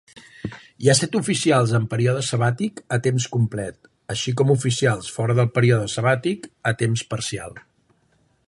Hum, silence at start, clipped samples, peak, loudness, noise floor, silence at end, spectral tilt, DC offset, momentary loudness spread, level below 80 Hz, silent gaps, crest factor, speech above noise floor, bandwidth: none; 0.15 s; under 0.1%; -2 dBFS; -21 LUFS; -63 dBFS; 0.9 s; -5 dB/octave; under 0.1%; 13 LU; -54 dBFS; none; 20 dB; 42 dB; 11.5 kHz